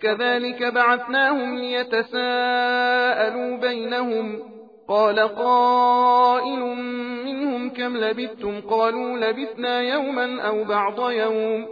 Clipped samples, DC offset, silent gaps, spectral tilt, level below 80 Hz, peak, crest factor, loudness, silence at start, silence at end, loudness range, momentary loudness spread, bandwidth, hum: under 0.1%; under 0.1%; none; -5.5 dB/octave; -70 dBFS; -6 dBFS; 16 dB; -21 LUFS; 0 s; 0 s; 4 LU; 10 LU; 5 kHz; none